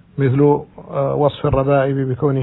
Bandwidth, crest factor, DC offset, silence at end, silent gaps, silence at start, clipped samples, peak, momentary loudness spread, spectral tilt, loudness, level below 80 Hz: 4.1 kHz; 14 dB; under 0.1%; 0 s; none; 0.15 s; under 0.1%; -2 dBFS; 6 LU; -12.5 dB/octave; -17 LUFS; -38 dBFS